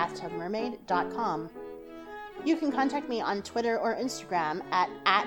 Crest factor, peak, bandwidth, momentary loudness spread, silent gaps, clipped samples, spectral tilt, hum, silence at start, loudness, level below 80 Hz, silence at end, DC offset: 22 dB; -8 dBFS; 19 kHz; 15 LU; none; under 0.1%; -4 dB/octave; none; 0 s; -30 LUFS; -64 dBFS; 0 s; under 0.1%